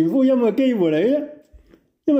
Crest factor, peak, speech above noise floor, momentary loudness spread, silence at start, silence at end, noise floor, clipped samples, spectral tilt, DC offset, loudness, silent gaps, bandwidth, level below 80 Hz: 10 dB; -8 dBFS; 37 dB; 10 LU; 0 s; 0 s; -54 dBFS; under 0.1%; -8 dB/octave; under 0.1%; -19 LUFS; none; 7.8 kHz; -60 dBFS